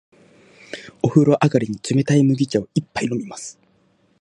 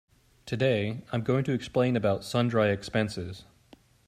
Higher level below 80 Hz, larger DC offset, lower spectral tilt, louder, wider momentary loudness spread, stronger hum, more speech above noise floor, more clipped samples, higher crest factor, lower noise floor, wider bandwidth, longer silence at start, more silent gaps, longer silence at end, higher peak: about the same, -58 dBFS vs -60 dBFS; neither; about the same, -6.5 dB/octave vs -6.5 dB/octave; first, -19 LUFS vs -28 LUFS; first, 20 LU vs 11 LU; neither; first, 42 dB vs 31 dB; neither; about the same, 18 dB vs 18 dB; about the same, -60 dBFS vs -58 dBFS; second, 11 kHz vs 14.5 kHz; first, 0.75 s vs 0.45 s; neither; about the same, 0.7 s vs 0.65 s; first, -2 dBFS vs -12 dBFS